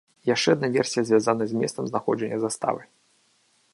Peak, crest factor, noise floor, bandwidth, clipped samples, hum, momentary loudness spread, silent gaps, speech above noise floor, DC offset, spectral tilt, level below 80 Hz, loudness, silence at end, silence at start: -6 dBFS; 20 dB; -65 dBFS; 11.5 kHz; under 0.1%; none; 7 LU; none; 41 dB; under 0.1%; -4.5 dB/octave; -70 dBFS; -24 LUFS; 0.9 s; 0.25 s